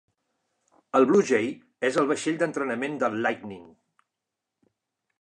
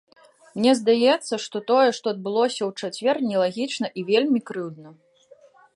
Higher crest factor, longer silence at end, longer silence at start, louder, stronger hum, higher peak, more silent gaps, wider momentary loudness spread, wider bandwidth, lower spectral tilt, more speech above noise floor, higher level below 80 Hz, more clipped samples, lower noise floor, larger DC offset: about the same, 20 dB vs 16 dB; first, 1.55 s vs 0.85 s; first, 0.95 s vs 0.55 s; second, -25 LUFS vs -22 LUFS; neither; about the same, -8 dBFS vs -6 dBFS; neither; first, 13 LU vs 10 LU; about the same, 10.5 kHz vs 11.5 kHz; about the same, -5 dB/octave vs -4.5 dB/octave; first, 61 dB vs 32 dB; about the same, -76 dBFS vs -76 dBFS; neither; first, -85 dBFS vs -54 dBFS; neither